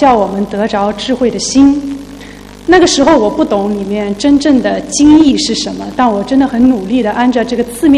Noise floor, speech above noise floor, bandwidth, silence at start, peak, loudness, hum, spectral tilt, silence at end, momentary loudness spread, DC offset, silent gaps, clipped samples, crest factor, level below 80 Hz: -30 dBFS; 21 dB; 13 kHz; 0 s; 0 dBFS; -10 LUFS; 50 Hz at -35 dBFS; -4.5 dB/octave; 0 s; 10 LU; under 0.1%; none; 0.4%; 10 dB; -36 dBFS